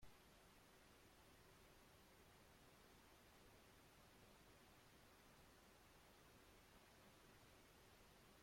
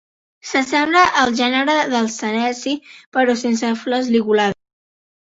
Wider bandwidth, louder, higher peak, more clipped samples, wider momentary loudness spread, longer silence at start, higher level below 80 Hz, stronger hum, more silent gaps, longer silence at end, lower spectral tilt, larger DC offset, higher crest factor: first, 16.5 kHz vs 8 kHz; second, -69 LUFS vs -17 LUFS; second, -52 dBFS vs -2 dBFS; neither; second, 1 LU vs 10 LU; second, 0 s vs 0.45 s; second, -78 dBFS vs -58 dBFS; neither; second, none vs 3.06-3.12 s; second, 0 s vs 0.8 s; about the same, -3.5 dB/octave vs -3.5 dB/octave; neither; about the same, 16 dB vs 18 dB